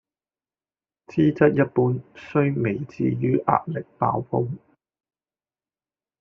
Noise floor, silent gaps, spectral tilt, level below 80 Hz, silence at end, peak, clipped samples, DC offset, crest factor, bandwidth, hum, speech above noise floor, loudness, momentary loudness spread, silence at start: under -90 dBFS; none; -8 dB/octave; -60 dBFS; 1.65 s; -2 dBFS; under 0.1%; under 0.1%; 22 dB; 6.6 kHz; none; over 68 dB; -23 LUFS; 11 LU; 1.1 s